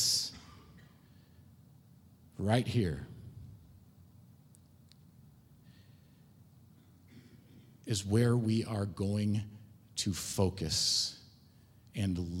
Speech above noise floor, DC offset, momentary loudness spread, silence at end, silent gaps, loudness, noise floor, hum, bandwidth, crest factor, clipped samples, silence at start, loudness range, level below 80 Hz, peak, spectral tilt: 29 dB; under 0.1%; 24 LU; 0 s; none; -33 LUFS; -61 dBFS; none; 16.5 kHz; 22 dB; under 0.1%; 0 s; 7 LU; -60 dBFS; -16 dBFS; -4.5 dB/octave